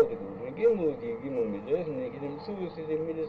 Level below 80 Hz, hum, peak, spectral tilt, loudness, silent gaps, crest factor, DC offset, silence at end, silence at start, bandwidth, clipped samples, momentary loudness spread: -62 dBFS; none; -12 dBFS; -9 dB/octave; -31 LUFS; none; 20 dB; under 0.1%; 0 s; 0 s; 5.2 kHz; under 0.1%; 11 LU